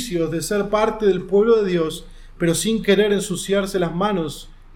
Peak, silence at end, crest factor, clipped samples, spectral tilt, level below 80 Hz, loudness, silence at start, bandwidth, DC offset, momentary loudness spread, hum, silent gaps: -4 dBFS; 0 s; 16 dB; under 0.1%; -5 dB/octave; -42 dBFS; -20 LUFS; 0 s; 17 kHz; under 0.1%; 8 LU; none; none